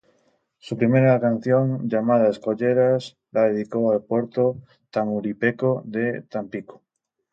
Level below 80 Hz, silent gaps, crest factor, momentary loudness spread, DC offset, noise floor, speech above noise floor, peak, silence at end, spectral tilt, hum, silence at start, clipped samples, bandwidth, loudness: -66 dBFS; none; 16 dB; 12 LU; under 0.1%; -79 dBFS; 57 dB; -6 dBFS; 0.55 s; -9 dB/octave; none; 0.65 s; under 0.1%; 7.8 kHz; -22 LUFS